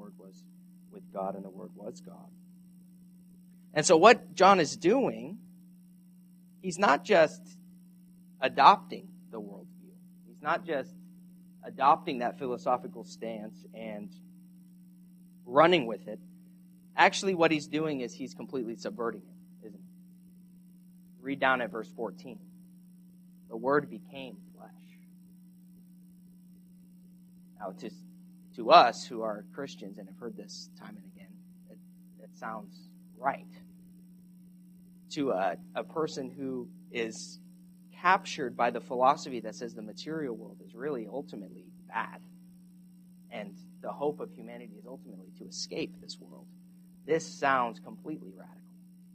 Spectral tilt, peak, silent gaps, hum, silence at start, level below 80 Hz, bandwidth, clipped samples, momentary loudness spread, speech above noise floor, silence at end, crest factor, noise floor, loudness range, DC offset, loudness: -4 dB/octave; -4 dBFS; none; none; 0 s; -78 dBFS; 14.5 kHz; under 0.1%; 25 LU; 26 dB; 0.65 s; 28 dB; -56 dBFS; 16 LU; under 0.1%; -29 LUFS